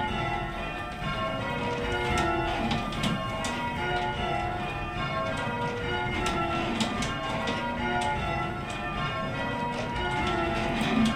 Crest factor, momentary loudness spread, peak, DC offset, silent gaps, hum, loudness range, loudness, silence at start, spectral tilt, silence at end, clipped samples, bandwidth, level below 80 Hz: 18 dB; 4 LU; -12 dBFS; under 0.1%; none; none; 1 LU; -29 LUFS; 0 s; -5 dB/octave; 0 s; under 0.1%; 15.5 kHz; -42 dBFS